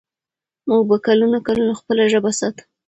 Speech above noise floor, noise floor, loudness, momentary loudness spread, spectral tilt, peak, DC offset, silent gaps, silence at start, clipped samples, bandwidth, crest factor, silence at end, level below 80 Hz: 72 dB; -89 dBFS; -17 LUFS; 7 LU; -4.5 dB/octave; -2 dBFS; under 0.1%; none; 0.65 s; under 0.1%; 8.8 kHz; 16 dB; 0.35 s; -58 dBFS